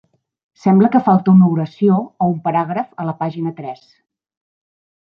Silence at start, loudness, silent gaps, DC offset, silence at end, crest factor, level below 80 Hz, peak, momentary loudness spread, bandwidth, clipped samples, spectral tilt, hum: 0.65 s; -16 LUFS; none; under 0.1%; 1.4 s; 14 dB; -60 dBFS; -2 dBFS; 13 LU; 5.6 kHz; under 0.1%; -10.5 dB/octave; none